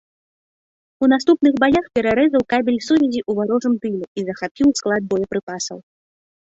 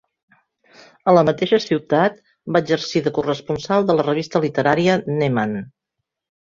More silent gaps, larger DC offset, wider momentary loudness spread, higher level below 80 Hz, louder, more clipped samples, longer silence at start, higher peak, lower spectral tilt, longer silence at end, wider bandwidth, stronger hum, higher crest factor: first, 4.08-4.15 s, 4.51-4.55 s, 5.43-5.47 s vs none; neither; first, 11 LU vs 8 LU; about the same, -52 dBFS vs -56 dBFS; about the same, -18 LUFS vs -19 LUFS; neither; about the same, 1 s vs 1.05 s; second, -4 dBFS vs 0 dBFS; second, -5 dB/octave vs -6.5 dB/octave; about the same, 0.8 s vs 0.8 s; about the same, 8 kHz vs 7.6 kHz; neither; about the same, 16 dB vs 18 dB